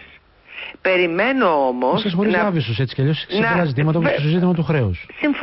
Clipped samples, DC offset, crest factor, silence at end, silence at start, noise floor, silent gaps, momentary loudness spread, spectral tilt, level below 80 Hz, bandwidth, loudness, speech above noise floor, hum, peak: under 0.1%; under 0.1%; 12 dB; 0 s; 0 s; -47 dBFS; none; 6 LU; -11.5 dB/octave; -44 dBFS; 5.8 kHz; -18 LUFS; 29 dB; none; -6 dBFS